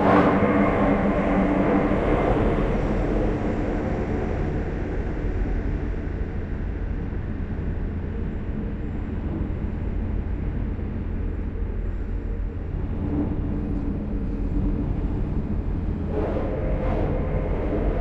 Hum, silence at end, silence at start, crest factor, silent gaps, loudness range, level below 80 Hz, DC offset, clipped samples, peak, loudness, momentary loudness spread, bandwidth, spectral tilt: none; 0 s; 0 s; 18 dB; none; 7 LU; -28 dBFS; under 0.1%; under 0.1%; -6 dBFS; -26 LUFS; 9 LU; 6.2 kHz; -9.5 dB/octave